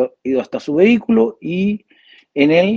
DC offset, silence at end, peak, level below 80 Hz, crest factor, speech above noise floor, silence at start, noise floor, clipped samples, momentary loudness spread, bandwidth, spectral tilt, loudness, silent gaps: under 0.1%; 0 s; 0 dBFS; -56 dBFS; 16 dB; 34 dB; 0 s; -49 dBFS; under 0.1%; 8 LU; 7.2 kHz; -7.5 dB/octave; -16 LUFS; none